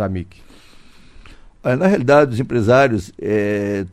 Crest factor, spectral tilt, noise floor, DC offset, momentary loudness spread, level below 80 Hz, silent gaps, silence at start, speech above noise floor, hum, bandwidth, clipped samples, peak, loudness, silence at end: 18 dB; -7 dB/octave; -42 dBFS; under 0.1%; 12 LU; -46 dBFS; none; 0 s; 26 dB; none; 13 kHz; under 0.1%; 0 dBFS; -16 LUFS; 0.05 s